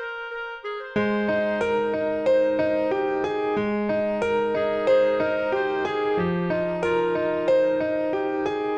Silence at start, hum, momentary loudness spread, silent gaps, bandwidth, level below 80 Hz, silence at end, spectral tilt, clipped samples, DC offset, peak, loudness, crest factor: 0 s; none; 5 LU; none; 8.6 kHz; -56 dBFS; 0 s; -7 dB/octave; under 0.1%; under 0.1%; -10 dBFS; -24 LUFS; 14 dB